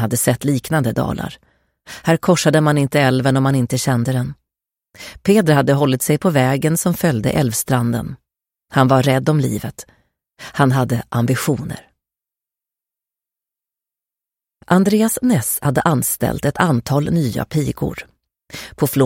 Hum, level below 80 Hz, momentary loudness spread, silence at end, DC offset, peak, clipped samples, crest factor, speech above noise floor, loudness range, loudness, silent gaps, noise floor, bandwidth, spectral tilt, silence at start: none; -46 dBFS; 15 LU; 0 s; under 0.1%; 0 dBFS; under 0.1%; 18 dB; 71 dB; 5 LU; -17 LUFS; none; -88 dBFS; 17 kHz; -5.5 dB/octave; 0 s